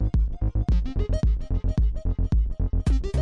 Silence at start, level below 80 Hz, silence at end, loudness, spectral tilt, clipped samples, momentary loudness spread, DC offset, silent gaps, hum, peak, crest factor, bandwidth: 0 s; -24 dBFS; 0 s; -26 LUFS; -8.5 dB/octave; under 0.1%; 3 LU; under 0.1%; none; none; -12 dBFS; 10 dB; 7.2 kHz